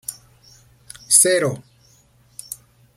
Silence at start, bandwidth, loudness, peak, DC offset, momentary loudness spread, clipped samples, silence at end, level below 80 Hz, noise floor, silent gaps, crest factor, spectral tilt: 0.1 s; 16.5 kHz; -15 LUFS; 0 dBFS; under 0.1%; 25 LU; under 0.1%; 0.4 s; -62 dBFS; -55 dBFS; none; 24 dB; -2 dB/octave